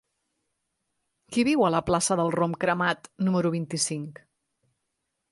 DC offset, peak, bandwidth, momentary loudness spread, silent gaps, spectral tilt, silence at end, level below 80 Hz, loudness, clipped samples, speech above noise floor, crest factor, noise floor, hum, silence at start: under 0.1%; -10 dBFS; 11.5 kHz; 6 LU; none; -4.5 dB/octave; 1.2 s; -58 dBFS; -25 LUFS; under 0.1%; 55 dB; 18 dB; -80 dBFS; none; 1.3 s